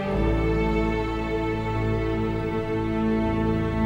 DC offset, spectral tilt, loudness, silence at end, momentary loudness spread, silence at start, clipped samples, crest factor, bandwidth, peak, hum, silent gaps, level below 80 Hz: under 0.1%; -8.5 dB/octave; -25 LUFS; 0 s; 3 LU; 0 s; under 0.1%; 12 dB; 8.4 kHz; -12 dBFS; none; none; -32 dBFS